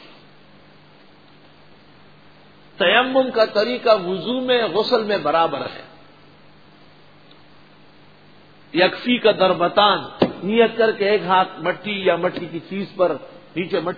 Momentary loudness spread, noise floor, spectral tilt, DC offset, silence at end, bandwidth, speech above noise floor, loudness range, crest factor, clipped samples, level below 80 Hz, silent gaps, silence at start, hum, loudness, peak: 13 LU; -49 dBFS; -6.5 dB/octave; 0.3%; 0 s; 5 kHz; 31 dB; 8 LU; 22 dB; under 0.1%; -62 dBFS; none; 2.8 s; 50 Hz at -60 dBFS; -19 LUFS; 0 dBFS